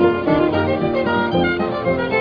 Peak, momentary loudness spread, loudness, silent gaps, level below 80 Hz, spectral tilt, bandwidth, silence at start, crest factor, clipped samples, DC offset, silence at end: -4 dBFS; 3 LU; -18 LUFS; none; -44 dBFS; -9 dB/octave; 5.4 kHz; 0 s; 14 dB; under 0.1%; under 0.1%; 0 s